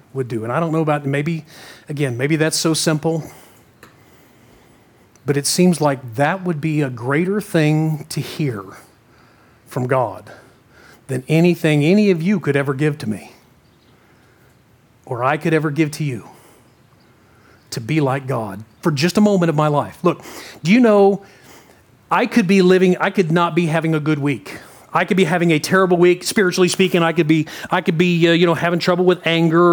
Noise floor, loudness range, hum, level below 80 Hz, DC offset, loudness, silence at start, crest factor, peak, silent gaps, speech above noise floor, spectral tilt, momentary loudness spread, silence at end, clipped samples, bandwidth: -53 dBFS; 8 LU; none; -62 dBFS; under 0.1%; -17 LUFS; 0.15 s; 16 dB; -2 dBFS; none; 36 dB; -5.5 dB/octave; 13 LU; 0 s; under 0.1%; over 20 kHz